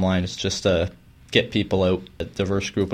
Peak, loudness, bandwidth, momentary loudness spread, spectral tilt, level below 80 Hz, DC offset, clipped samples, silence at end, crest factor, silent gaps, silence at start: -2 dBFS; -23 LUFS; 11 kHz; 7 LU; -5 dB/octave; -44 dBFS; under 0.1%; under 0.1%; 0 s; 20 dB; none; 0 s